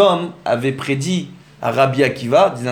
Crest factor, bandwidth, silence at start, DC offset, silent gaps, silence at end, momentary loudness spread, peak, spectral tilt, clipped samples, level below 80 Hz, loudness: 16 dB; 17 kHz; 0 s; under 0.1%; none; 0 s; 8 LU; 0 dBFS; -5.5 dB/octave; under 0.1%; -58 dBFS; -18 LUFS